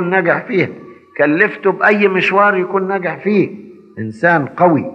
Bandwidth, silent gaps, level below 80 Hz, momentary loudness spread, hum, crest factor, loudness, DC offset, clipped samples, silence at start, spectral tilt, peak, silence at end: 8 kHz; none; -72 dBFS; 9 LU; none; 14 dB; -14 LUFS; under 0.1%; under 0.1%; 0 s; -7.5 dB/octave; 0 dBFS; 0 s